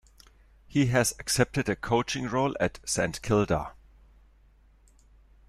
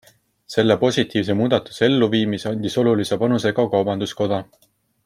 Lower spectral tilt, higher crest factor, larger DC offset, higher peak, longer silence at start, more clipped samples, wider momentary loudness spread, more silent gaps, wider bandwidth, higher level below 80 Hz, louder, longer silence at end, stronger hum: second, -4.5 dB/octave vs -6 dB/octave; about the same, 22 dB vs 18 dB; neither; second, -6 dBFS vs -2 dBFS; first, 0.7 s vs 0.5 s; neither; about the same, 6 LU vs 6 LU; neither; about the same, 14.5 kHz vs 15 kHz; first, -50 dBFS vs -60 dBFS; second, -27 LUFS vs -20 LUFS; first, 1.75 s vs 0.6 s; neither